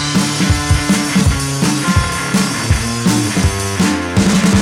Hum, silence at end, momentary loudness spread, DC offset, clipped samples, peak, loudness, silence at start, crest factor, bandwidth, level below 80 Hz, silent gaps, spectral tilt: none; 0 s; 3 LU; under 0.1%; under 0.1%; -2 dBFS; -14 LUFS; 0 s; 12 dB; 16.5 kHz; -26 dBFS; none; -4.5 dB/octave